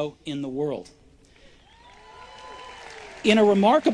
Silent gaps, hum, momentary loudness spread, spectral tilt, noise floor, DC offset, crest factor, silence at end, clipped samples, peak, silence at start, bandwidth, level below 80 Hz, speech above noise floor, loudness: none; none; 24 LU; -5.5 dB/octave; -53 dBFS; under 0.1%; 18 dB; 0 s; under 0.1%; -6 dBFS; 0 s; 10.5 kHz; -58 dBFS; 32 dB; -22 LUFS